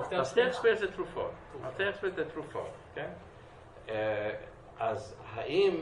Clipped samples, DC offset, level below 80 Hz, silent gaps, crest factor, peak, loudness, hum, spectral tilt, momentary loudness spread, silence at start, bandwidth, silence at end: under 0.1%; under 0.1%; -60 dBFS; none; 20 dB; -14 dBFS; -34 LUFS; none; -5 dB/octave; 19 LU; 0 s; 11 kHz; 0 s